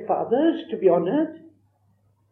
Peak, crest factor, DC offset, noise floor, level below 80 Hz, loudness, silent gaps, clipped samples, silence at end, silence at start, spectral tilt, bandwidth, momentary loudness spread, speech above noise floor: -6 dBFS; 18 dB; under 0.1%; -64 dBFS; -80 dBFS; -22 LUFS; none; under 0.1%; 0.95 s; 0 s; -10 dB/octave; 4.1 kHz; 5 LU; 42 dB